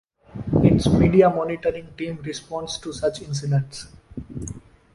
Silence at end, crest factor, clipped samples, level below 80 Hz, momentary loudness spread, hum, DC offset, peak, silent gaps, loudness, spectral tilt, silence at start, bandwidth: 0.35 s; 20 dB; under 0.1%; -40 dBFS; 21 LU; none; under 0.1%; -2 dBFS; none; -22 LUFS; -7 dB/octave; 0.35 s; 11.5 kHz